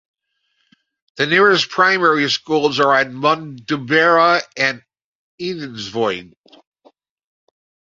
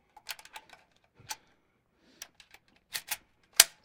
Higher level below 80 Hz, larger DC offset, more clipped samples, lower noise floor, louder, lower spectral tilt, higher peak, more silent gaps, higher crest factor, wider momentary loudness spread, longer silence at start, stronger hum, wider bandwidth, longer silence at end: first, -64 dBFS vs -70 dBFS; neither; neither; second, -68 dBFS vs -72 dBFS; first, -16 LUFS vs -30 LUFS; first, -4 dB/octave vs 2.5 dB/octave; about the same, 0 dBFS vs 0 dBFS; first, 5.04-5.38 s vs none; second, 18 dB vs 36 dB; second, 14 LU vs 26 LU; first, 1.15 s vs 0.3 s; neither; second, 7.6 kHz vs 17.5 kHz; first, 1.7 s vs 0.2 s